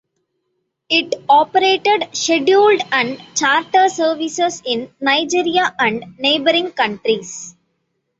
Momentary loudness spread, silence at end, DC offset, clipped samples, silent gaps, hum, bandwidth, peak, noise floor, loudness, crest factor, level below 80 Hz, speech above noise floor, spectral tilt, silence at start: 7 LU; 0.7 s; under 0.1%; under 0.1%; none; none; 8 kHz; -2 dBFS; -72 dBFS; -16 LUFS; 14 dB; -62 dBFS; 55 dB; -2 dB/octave; 0.9 s